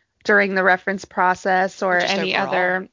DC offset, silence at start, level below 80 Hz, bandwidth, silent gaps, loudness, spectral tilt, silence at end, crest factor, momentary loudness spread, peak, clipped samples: under 0.1%; 0.25 s; -62 dBFS; 7.6 kHz; none; -19 LUFS; -4.5 dB/octave; 0.05 s; 16 dB; 4 LU; -2 dBFS; under 0.1%